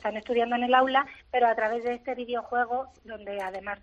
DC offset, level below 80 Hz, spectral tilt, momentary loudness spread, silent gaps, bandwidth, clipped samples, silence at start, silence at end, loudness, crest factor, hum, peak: under 0.1%; -62 dBFS; -5 dB/octave; 12 LU; none; 7.8 kHz; under 0.1%; 0.05 s; 0.05 s; -27 LUFS; 18 dB; none; -8 dBFS